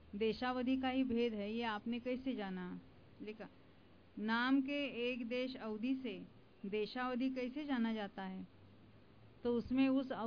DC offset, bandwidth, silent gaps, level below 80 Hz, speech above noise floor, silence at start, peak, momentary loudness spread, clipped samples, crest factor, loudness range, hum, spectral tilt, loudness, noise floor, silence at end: under 0.1%; 5.4 kHz; none; -68 dBFS; 26 dB; 0 s; -24 dBFS; 17 LU; under 0.1%; 16 dB; 3 LU; none; -3.5 dB/octave; -39 LUFS; -65 dBFS; 0 s